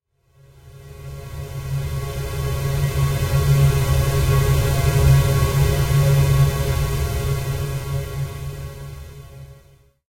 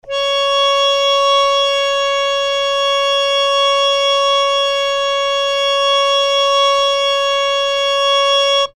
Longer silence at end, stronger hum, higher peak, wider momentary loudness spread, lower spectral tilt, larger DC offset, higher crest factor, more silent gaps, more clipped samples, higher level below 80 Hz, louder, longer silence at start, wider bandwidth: first, 0.65 s vs 0.1 s; neither; about the same, -4 dBFS vs -4 dBFS; first, 19 LU vs 3 LU; first, -6 dB/octave vs 2 dB/octave; neither; about the same, 16 dB vs 12 dB; neither; neither; first, -28 dBFS vs -50 dBFS; second, -20 LUFS vs -13 LUFS; first, 0.65 s vs 0.05 s; first, 16 kHz vs 13 kHz